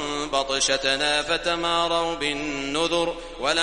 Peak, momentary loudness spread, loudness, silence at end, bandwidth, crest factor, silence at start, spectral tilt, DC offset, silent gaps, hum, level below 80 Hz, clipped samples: -4 dBFS; 6 LU; -23 LUFS; 0 s; 11.5 kHz; 20 dB; 0 s; -2 dB/octave; 0.2%; none; none; -46 dBFS; under 0.1%